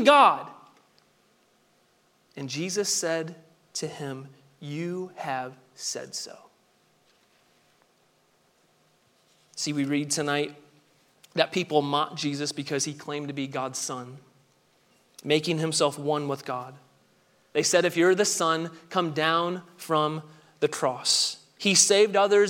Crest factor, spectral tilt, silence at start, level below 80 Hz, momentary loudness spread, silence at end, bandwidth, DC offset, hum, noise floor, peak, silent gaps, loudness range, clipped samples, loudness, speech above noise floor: 24 dB; -3 dB/octave; 0 s; -80 dBFS; 16 LU; 0 s; 16.5 kHz; under 0.1%; none; -66 dBFS; -4 dBFS; none; 11 LU; under 0.1%; -26 LUFS; 40 dB